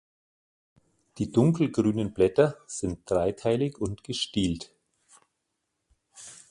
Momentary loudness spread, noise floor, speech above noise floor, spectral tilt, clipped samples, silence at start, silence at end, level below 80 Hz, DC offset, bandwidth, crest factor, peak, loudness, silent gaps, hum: 14 LU; -80 dBFS; 54 dB; -6 dB/octave; under 0.1%; 1.15 s; 0.15 s; -52 dBFS; under 0.1%; 11.5 kHz; 20 dB; -8 dBFS; -27 LUFS; none; none